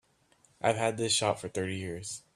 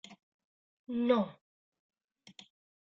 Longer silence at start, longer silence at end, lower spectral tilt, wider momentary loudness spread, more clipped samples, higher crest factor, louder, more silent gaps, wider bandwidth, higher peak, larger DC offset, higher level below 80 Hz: first, 0.6 s vs 0.1 s; second, 0.15 s vs 1.5 s; second, -3 dB/octave vs -5 dB/octave; second, 10 LU vs 25 LU; neither; about the same, 22 dB vs 24 dB; about the same, -31 LUFS vs -32 LUFS; second, none vs 0.23-0.85 s; first, 14 kHz vs 7.6 kHz; first, -10 dBFS vs -14 dBFS; neither; first, -68 dBFS vs -78 dBFS